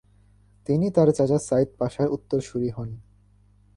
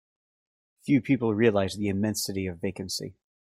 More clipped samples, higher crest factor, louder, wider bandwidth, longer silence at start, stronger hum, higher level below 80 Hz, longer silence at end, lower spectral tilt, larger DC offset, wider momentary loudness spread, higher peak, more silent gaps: neither; about the same, 18 dB vs 20 dB; first, -24 LUFS vs -27 LUFS; second, 11.5 kHz vs 16.5 kHz; second, 0.7 s vs 0.85 s; first, 50 Hz at -50 dBFS vs none; first, -54 dBFS vs -64 dBFS; first, 0.75 s vs 0.4 s; first, -8 dB/octave vs -5.5 dB/octave; neither; first, 17 LU vs 11 LU; about the same, -8 dBFS vs -8 dBFS; neither